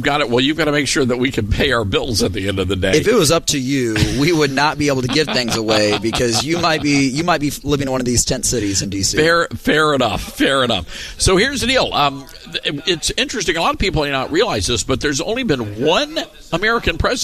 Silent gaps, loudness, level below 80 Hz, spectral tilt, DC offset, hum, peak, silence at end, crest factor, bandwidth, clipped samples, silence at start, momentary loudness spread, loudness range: none; -16 LUFS; -34 dBFS; -3.5 dB/octave; under 0.1%; none; -2 dBFS; 0 s; 16 dB; 14.5 kHz; under 0.1%; 0 s; 5 LU; 2 LU